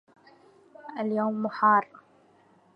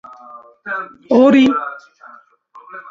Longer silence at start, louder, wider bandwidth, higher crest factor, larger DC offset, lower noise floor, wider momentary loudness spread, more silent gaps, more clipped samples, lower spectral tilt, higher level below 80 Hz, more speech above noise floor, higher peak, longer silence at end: first, 0.85 s vs 0.35 s; second, -26 LUFS vs -14 LUFS; second, 5.4 kHz vs 7.4 kHz; about the same, 18 dB vs 16 dB; neither; first, -61 dBFS vs -45 dBFS; second, 23 LU vs 26 LU; neither; neither; first, -8.5 dB/octave vs -6 dB/octave; second, -84 dBFS vs -60 dBFS; first, 36 dB vs 31 dB; second, -10 dBFS vs 0 dBFS; first, 0.9 s vs 0.1 s